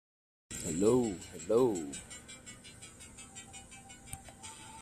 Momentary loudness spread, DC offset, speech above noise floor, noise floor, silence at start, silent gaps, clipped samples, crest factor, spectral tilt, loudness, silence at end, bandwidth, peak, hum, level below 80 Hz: 21 LU; under 0.1%; 21 dB; -53 dBFS; 0.5 s; none; under 0.1%; 20 dB; -5 dB/octave; -33 LUFS; 0 s; 14.5 kHz; -16 dBFS; none; -62 dBFS